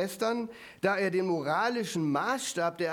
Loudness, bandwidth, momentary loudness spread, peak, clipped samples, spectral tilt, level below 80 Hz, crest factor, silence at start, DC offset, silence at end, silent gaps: -30 LUFS; 19.5 kHz; 4 LU; -14 dBFS; under 0.1%; -4.5 dB/octave; -74 dBFS; 16 dB; 0 s; under 0.1%; 0 s; none